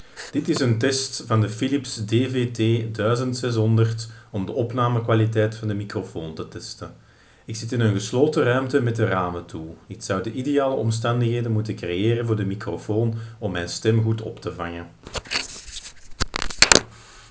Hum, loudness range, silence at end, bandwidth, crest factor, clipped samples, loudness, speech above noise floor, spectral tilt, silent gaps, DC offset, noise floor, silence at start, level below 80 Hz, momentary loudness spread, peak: none; 3 LU; 0.05 s; 8 kHz; 24 dB; under 0.1%; -23 LUFS; 20 dB; -5 dB/octave; none; under 0.1%; -42 dBFS; 0 s; -46 dBFS; 14 LU; 0 dBFS